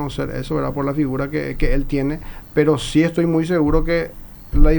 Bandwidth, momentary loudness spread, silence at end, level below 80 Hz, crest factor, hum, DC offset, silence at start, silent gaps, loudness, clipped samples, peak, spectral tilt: over 20 kHz; 8 LU; 0 s; -22 dBFS; 18 dB; none; under 0.1%; 0 s; none; -20 LUFS; under 0.1%; 0 dBFS; -7 dB/octave